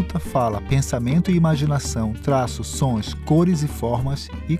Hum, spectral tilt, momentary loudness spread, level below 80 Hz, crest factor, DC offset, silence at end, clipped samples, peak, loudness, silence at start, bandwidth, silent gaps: none; -6.5 dB/octave; 7 LU; -36 dBFS; 14 dB; under 0.1%; 0 s; under 0.1%; -6 dBFS; -21 LUFS; 0 s; 15 kHz; none